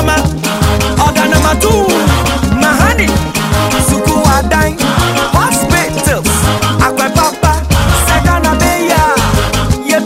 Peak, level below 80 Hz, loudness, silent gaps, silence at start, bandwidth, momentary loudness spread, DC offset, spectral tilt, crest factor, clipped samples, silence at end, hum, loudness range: 0 dBFS; -18 dBFS; -10 LUFS; none; 0 s; 16.5 kHz; 3 LU; under 0.1%; -4.5 dB/octave; 10 dB; under 0.1%; 0 s; none; 1 LU